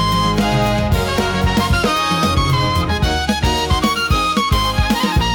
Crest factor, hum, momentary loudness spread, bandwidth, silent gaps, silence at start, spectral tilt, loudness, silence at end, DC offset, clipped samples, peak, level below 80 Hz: 10 dB; none; 2 LU; 18 kHz; none; 0 s; -5 dB/octave; -16 LUFS; 0 s; under 0.1%; under 0.1%; -4 dBFS; -24 dBFS